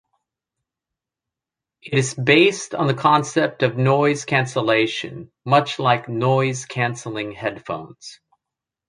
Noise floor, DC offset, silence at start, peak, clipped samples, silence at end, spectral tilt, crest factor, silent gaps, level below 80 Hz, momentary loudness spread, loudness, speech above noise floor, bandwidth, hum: -87 dBFS; under 0.1%; 1.85 s; -2 dBFS; under 0.1%; 0.75 s; -5 dB/octave; 20 dB; none; -62 dBFS; 14 LU; -19 LUFS; 67 dB; 10.5 kHz; none